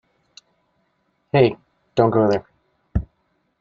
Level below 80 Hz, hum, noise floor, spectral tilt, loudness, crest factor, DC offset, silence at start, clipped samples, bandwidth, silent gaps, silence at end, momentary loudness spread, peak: -40 dBFS; none; -68 dBFS; -8 dB/octave; -20 LUFS; 20 dB; under 0.1%; 1.35 s; under 0.1%; 7.2 kHz; none; 0.55 s; 14 LU; -2 dBFS